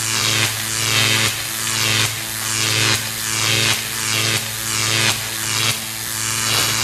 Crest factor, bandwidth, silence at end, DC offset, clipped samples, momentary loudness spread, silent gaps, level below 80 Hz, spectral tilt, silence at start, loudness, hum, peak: 18 dB; 14 kHz; 0 s; under 0.1%; under 0.1%; 5 LU; none; -48 dBFS; -1 dB/octave; 0 s; -17 LUFS; none; -2 dBFS